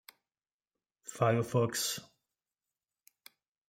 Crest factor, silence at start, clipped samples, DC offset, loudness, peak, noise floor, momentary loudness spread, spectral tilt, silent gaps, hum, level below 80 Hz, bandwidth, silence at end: 22 dB; 1.05 s; under 0.1%; under 0.1%; -32 LUFS; -16 dBFS; under -90 dBFS; 17 LU; -4.5 dB/octave; none; none; -76 dBFS; 16 kHz; 1.65 s